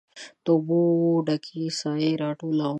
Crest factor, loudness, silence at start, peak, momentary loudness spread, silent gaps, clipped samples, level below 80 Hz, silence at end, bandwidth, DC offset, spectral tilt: 16 dB; -24 LUFS; 0.15 s; -10 dBFS; 9 LU; none; under 0.1%; -76 dBFS; 0 s; 9 kHz; under 0.1%; -6.5 dB/octave